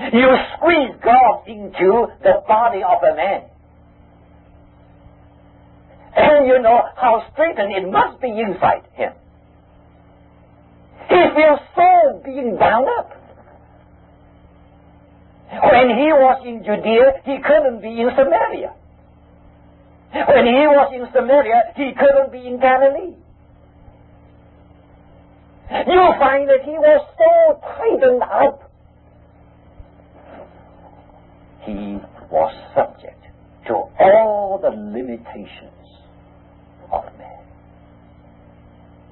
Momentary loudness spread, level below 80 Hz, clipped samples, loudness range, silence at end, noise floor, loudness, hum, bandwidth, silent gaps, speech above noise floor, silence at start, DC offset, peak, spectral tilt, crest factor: 15 LU; -48 dBFS; under 0.1%; 11 LU; 1.85 s; -48 dBFS; -15 LUFS; none; 4.2 kHz; none; 34 dB; 0 s; under 0.1%; -2 dBFS; -10 dB/octave; 16 dB